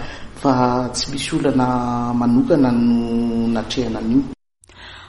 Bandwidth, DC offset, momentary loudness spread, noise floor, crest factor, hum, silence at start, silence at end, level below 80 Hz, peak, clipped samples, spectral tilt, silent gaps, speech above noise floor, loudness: 11.5 kHz; under 0.1%; 7 LU; -45 dBFS; 16 dB; none; 0 s; 0 s; -38 dBFS; -2 dBFS; under 0.1%; -6 dB/octave; none; 27 dB; -18 LUFS